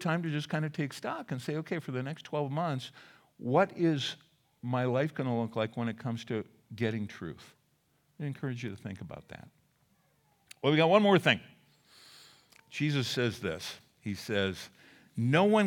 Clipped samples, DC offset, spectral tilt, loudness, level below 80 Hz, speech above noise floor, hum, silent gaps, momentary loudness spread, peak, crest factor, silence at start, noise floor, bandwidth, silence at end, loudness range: under 0.1%; under 0.1%; -6 dB/octave; -32 LUFS; -74 dBFS; 41 dB; none; none; 18 LU; -10 dBFS; 24 dB; 0 s; -72 dBFS; 17.5 kHz; 0 s; 10 LU